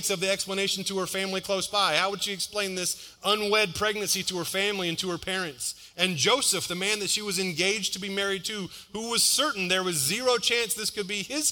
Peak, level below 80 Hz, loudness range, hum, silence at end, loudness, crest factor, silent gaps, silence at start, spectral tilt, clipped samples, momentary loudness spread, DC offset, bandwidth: -8 dBFS; -62 dBFS; 2 LU; none; 0 s; -26 LUFS; 20 dB; none; 0 s; -1.5 dB/octave; under 0.1%; 8 LU; under 0.1%; 18 kHz